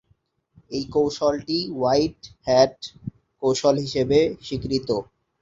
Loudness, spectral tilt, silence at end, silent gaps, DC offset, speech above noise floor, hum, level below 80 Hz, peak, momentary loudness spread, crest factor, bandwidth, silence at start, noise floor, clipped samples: -23 LUFS; -5.5 dB/octave; 0.4 s; none; under 0.1%; 44 dB; none; -50 dBFS; -4 dBFS; 14 LU; 20 dB; 7.8 kHz; 0.7 s; -66 dBFS; under 0.1%